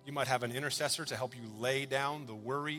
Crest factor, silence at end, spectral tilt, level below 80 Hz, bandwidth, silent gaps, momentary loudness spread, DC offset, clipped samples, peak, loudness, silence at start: 20 dB; 0 s; -3.5 dB/octave; -74 dBFS; 17.5 kHz; none; 7 LU; under 0.1%; under 0.1%; -16 dBFS; -35 LUFS; 0.05 s